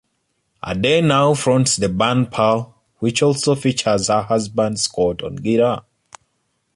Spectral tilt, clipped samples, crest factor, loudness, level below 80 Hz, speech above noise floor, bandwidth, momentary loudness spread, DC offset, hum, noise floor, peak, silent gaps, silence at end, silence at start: -4.5 dB/octave; under 0.1%; 16 dB; -18 LUFS; -48 dBFS; 52 dB; 11.5 kHz; 8 LU; under 0.1%; none; -69 dBFS; -2 dBFS; none; 0.95 s; 0.65 s